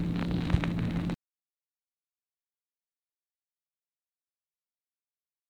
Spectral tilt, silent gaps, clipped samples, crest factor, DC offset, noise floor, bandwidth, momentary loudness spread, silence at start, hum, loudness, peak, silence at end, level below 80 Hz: -8 dB/octave; none; under 0.1%; 26 dB; under 0.1%; under -90 dBFS; 9.2 kHz; 7 LU; 0 s; none; -31 LUFS; -10 dBFS; 4.35 s; -46 dBFS